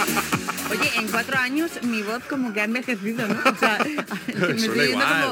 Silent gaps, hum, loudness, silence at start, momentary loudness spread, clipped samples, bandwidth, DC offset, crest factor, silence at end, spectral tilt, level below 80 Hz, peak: none; none; -22 LUFS; 0 s; 7 LU; under 0.1%; 17 kHz; under 0.1%; 20 dB; 0 s; -3.5 dB/octave; -60 dBFS; -4 dBFS